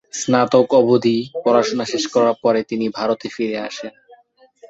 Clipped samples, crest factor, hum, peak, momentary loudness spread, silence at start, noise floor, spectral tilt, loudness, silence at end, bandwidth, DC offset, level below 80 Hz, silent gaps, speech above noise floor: under 0.1%; 16 dB; none; -2 dBFS; 10 LU; 0.15 s; -52 dBFS; -4.5 dB/octave; -18 LUFS; 0.05 s; 8 kHz; under 0.1%; -62 dBFS; none; 35 dB